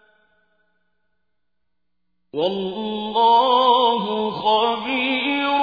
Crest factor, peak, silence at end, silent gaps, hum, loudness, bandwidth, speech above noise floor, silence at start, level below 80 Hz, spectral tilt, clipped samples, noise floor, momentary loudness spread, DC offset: 16 dB; -4 dBFS; 0 s; none; 60 Hz at -65 dBFS; -19 LUFS; 5 kHz; 61 dB; 2.35 s; -62 dBFS; -6 dB/octave; under 0.1%; -80 dBFS; 11 LU; under 0.1%